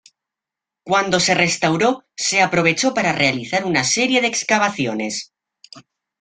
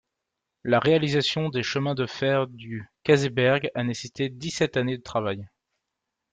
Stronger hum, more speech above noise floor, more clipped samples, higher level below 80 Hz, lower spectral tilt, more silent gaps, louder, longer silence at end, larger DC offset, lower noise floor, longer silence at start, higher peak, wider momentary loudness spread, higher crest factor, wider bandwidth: neither; first, 68 dB vs 59 dB; neither; about the same, -58 dBFS vs -60 dBFS; second, -3 dB/octave vs -5.5 dB/octave; neither; first, -17 LUFS vs -25 LUFS; second, 0.4 s vs 0.85 s; neither; about the same, -86 dBFS vs -84 dBFS; first, 0.85 s vs 0.65 s; first, 0 dBFS vs -6 dBFS; second, 6 LU vs 11 LU; about the same, 18 dB vs 20 dB; first, 10.5 kHz vs 9.4 kHz